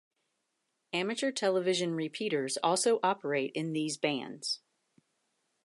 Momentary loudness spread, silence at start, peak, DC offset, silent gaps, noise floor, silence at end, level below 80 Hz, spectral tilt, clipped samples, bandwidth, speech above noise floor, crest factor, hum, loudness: 8 LU; 0.95 s; -14 dBFS; under 0.1%; none; -81 dBFS; 1.05 s; -86 dBFS; -3.5 dB/octave; under 0.1%; 11.5 kHz; 50 dB; 20 dB; none; -32 LUFS